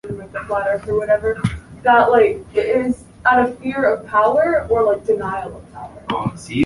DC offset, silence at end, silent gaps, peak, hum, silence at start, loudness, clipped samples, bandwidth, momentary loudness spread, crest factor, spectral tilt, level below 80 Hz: under 0.1%; 0 s; none; -2 dBFS; none; 0.05 s; -18 LUFS; under 0.1%; 11.5 kHz; 13 LU; 16 dB; -6.5 dB/octave; -42 dBFS